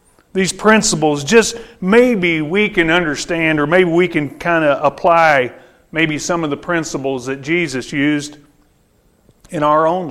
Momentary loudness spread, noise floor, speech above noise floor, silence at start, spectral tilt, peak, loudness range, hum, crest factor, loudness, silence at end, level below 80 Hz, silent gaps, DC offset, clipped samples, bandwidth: 10 LU; -55 dBFS; 41 dB; 0.35 s; -4.5 dB/octave; 0 dBFS; 6 LU; none; 16 dB; -15 LUFS; 0 s; -44 dBFS; none; under 0.1%; under 0.1%; 15 kHz